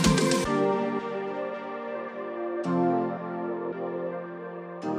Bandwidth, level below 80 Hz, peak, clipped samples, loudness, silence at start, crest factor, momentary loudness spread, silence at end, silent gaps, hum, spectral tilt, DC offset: 15 kHz; -50 dBFS; -8 dBFS; under 0.1%; -29 LUFS; 0 s; 20 dB; 11 LU; 0 s; none; none; -5 dB/octave; under 0.1%